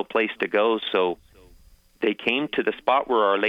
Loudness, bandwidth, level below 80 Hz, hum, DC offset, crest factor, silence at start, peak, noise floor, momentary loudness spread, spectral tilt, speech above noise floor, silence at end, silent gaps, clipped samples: -23 LUFS; 6.2 kHz; -60 dBFS; none; under 0.1%; 18 dB; 0 s; -6 dBFS; -53 dBFS; 6 LU; -5.5 dB/octave; 31 dB; 0 s; none; under 0.1%